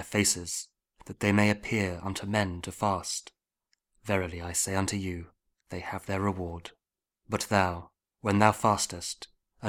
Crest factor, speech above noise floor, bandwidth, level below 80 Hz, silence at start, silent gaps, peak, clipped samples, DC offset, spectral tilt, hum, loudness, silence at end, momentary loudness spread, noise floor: 26 dB; 49 dB; 18.5 kHz; -56 dBFS; 0 s; none; -4 dBFS; under 0.1%; under 0.1%; -4 dB/octave; none; -29 LUFS; 0 s; 17 LU; -78 dBFS